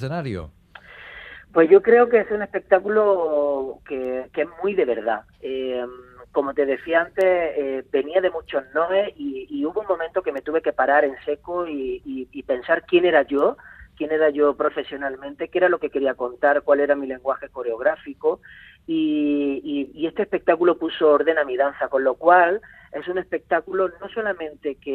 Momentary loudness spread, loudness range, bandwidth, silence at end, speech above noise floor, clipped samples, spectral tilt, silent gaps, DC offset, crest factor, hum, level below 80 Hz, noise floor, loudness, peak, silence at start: 13 LU; 5 LU; 4.7 kHz; 0 s; 23 dB; under 0.1%; -7.5 dB/octave; none; under 0.1%; 20 dB; none; -56 dBFS; -44 dBFS; -22 LUFS; -2 dBFS; 0 s